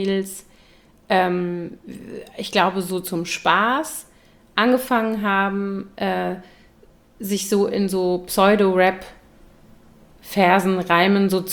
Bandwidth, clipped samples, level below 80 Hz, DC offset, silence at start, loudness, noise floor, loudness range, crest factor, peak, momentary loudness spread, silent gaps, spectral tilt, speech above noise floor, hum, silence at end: over 20 kHz; under 0.1%; -54 dBFS; under 0.1%; 0 s; -20 LUFS; -52 dBFS; 4 LU; 20 dB; -2 dBFS; 18 LU; none; -5 dB/octave; 32 dB; none; 0 s